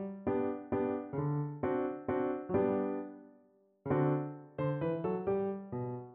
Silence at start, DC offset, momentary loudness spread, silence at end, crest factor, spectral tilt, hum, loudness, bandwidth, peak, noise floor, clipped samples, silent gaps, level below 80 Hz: 0 s; under 0.1%; 8 LU; 0 s; 16 dB; -9 dB/octave; none; -35 LUFS; 3.8 kHz; -20 dBFS; -67 dBFS; under 0.1%; none; -64 dBFS